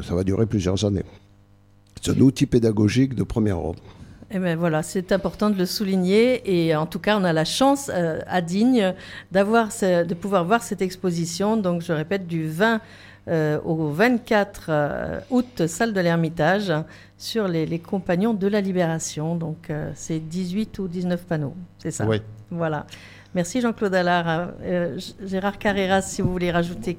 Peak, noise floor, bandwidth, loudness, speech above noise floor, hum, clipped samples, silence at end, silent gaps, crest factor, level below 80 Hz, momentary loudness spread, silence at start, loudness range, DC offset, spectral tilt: -6 dBFS; -54 dBFS; 16.5 kHz; -23 LUFS; 32 dB; none; under 0.1%; 0 s; none; 18 dB; -48 dBFS; 10 LU; 0 s; 5 LU; under 0.1%; -6 dB/octave